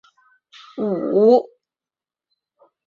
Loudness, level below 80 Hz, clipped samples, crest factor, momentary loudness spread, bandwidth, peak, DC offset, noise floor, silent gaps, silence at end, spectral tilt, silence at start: -18 LUFS; -70 dBFS; under 0.1%; 20 dB; 23 LU; 7 kHz; -2 dBFS; under 0.1%; under -90 dBFS; none; 1.4 s; -8.5 dB/octave; 0.75 s